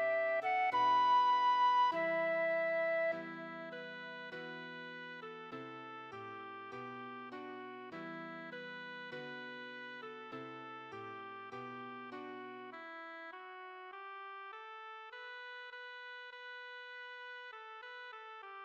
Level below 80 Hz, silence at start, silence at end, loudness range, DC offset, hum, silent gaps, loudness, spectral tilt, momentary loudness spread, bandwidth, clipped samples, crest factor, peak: under -90 dBFS; 0 s; 0 s; 16 LU; under 0.1%; none; none; -39 LUFS; -4.5 dB/octave; 18 LU; 6.8 kHz; under 0.1%; 16 dB; -24 dBFS